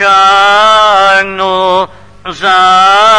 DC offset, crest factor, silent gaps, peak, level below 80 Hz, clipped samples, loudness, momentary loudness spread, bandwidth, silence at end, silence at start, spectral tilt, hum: 1%; 6 dB; none; 0 dBFS; -44 dBFS; 2%; -6 LUFS; 11 LU; 11 kHz; 0 s; 0 s; -2 dB/octave; none